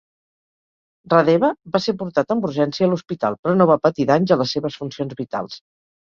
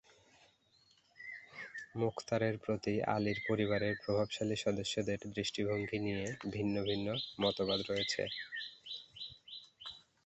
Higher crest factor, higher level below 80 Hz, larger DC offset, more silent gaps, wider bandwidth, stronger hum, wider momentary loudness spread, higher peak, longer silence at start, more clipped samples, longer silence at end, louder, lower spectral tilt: about the same, 18 dB vs 20 dB; first, -60 dBFS vs -66 dBFS; neither; first, 3.39-3.43 s vs none; second, 7.2 kHz vs 8.2 kHz; neither; about the same, 12 LU vs 13 LU; first, -2 dBFS vs -18 dBFS; about the same, 1.1 s vs 1.2 s; neither; first, 0.45 s vs 0.25 s; first, -19 LUFS vs -37 LUFS; first, -7 dB/octave vs -5 dB/octave